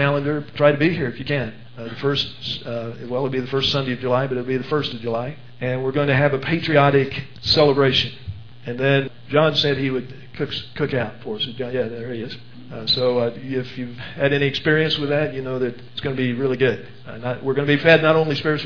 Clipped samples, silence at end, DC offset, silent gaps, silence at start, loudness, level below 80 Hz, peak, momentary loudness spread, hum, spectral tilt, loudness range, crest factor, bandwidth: under 0.1%; 0 s; 1%; none; 0 s; -21 LUFS; -52 dBFS; 0 dBFS; 14 LU; none; -6.5 dB/octave; 5 LU; 20 dB; 5.4 kHz